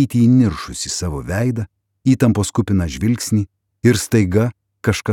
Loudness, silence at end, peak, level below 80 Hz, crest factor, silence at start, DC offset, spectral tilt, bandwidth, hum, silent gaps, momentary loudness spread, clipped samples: -18 LUFS; 0 s; -2 dBFS; -38 dBFS; 16 dB; 0 s; under 0.1%; -6 dB/octave; 17 kHz; none; none; 9 LU; under 0.1%